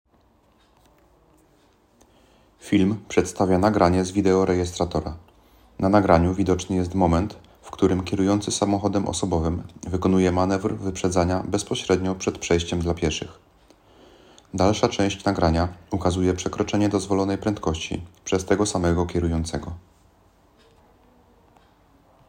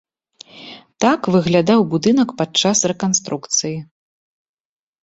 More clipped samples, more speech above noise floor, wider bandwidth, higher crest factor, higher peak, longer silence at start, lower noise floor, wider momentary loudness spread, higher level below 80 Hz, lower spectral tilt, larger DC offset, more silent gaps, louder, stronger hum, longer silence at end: neither; first, 38 dB vs 29 dB; first, 15.5 kHz vs 8.2 kHz; about the same, 22 dB vs 18 dB; about the same, -2 dBFS vs -2 dBFS; first, 2.65 s vs 0.55 s; first, -60 dBFS vs -46 dBFS; second, 10 LU vs 19 LU; first, -46 dBFS vs -56 dBFS; first, -6 dB/octave vs -4 dB/octave; neither; neither; second, -23 LUFS vs -17 LUFS; neither; first, 2.5 s vs 1.2 s